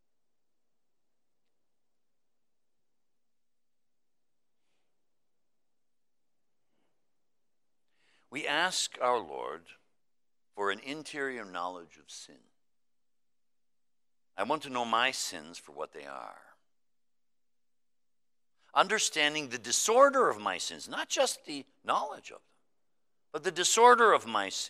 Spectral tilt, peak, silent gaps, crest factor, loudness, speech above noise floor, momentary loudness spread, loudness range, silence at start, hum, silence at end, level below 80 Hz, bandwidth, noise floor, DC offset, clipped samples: -1 dB/octave; -8 dBFS; none; 26 dB; -29 LUFS; over 60 dB; 22 LU; 14 LU; 8.3 s; none; 0 s; -86 dBFS; 15.5 kHz; under -90 dBFS; under 0.1%; under 0.1%